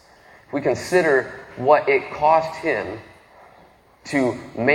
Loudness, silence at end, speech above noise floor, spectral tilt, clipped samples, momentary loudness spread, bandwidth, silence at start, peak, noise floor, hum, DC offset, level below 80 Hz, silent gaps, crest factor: -20 LUFS; 0 s; 32 dB; -5.5 dB/octave; under 0.1%; 12 LU; 16 kHz; 0.5 s; -2 dBFS; -52 dBFS; none; under 0.1%; -56 dBFS; none; 20 dB